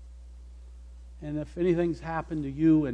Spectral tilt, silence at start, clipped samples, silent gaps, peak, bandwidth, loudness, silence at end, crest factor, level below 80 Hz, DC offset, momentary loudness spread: -9 dB/octave; 0 s; under 0.1%; none; -12 dBFS; 8.2 kHz; -28 LUFS; 0 s; 16 dB; -46 dBFS; under 0.1%; 25 LU